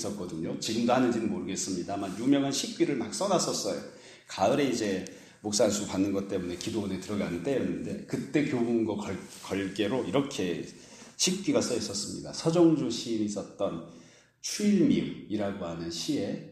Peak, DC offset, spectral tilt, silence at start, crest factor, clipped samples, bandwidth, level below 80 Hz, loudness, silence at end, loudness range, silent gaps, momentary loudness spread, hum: -12 dBFS; under 0.1%; -4.5 dB/octave; 0 s; 18 dB; under 0.1%; 15.5 kHz; -64 dBFS; -30 LUFS; 0 s; 3 LU; none; 10 LU; none